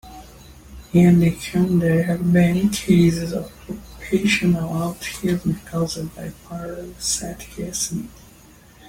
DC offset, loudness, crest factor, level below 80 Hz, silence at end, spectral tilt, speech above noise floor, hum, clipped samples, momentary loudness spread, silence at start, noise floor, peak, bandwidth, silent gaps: under 0.1%; -20 LUFS; 16 dB; -44 dBFS; 0 s; -5.5 dB/octave; 28 dB; none; under 0.1%; 17 LU; 0.05 s; -48 dBFS; -4 dBFS; 16.5 kHz; none